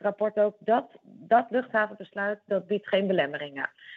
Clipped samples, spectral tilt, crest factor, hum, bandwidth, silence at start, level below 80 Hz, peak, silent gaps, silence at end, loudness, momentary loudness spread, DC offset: under 0.1%; -8 dB/octave; 18 dB; none; 4.7 kHz; 0 s; -82 dBFS; -10 dBFS; none; 0 s; -27 LUFS; 8 LU; under 0.1%